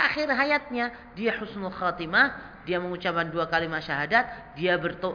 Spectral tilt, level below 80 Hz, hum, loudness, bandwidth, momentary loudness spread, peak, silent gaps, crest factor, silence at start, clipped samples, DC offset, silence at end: -6 dB/octave; -56 dBFS; none; -26 LUFS; 5.4 kHz; 9 LU; -8 dBFS; none; 20 dB; 0 s; under 0.1%; under 0.1%; 0 s